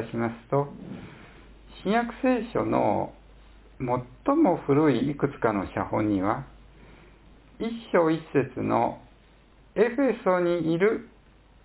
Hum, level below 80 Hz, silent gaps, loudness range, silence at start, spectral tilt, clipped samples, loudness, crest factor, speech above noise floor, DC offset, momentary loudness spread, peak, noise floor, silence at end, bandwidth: none; -52 dBFS; none; 3 LU; 0 s; -11 dB/octave; under 0.1%; -26 LUFS; 20 dB; 30 dB; under 0.1%; 13 LU; -8 dBFS; -55 dBFS; 0.6 s; 4 kHz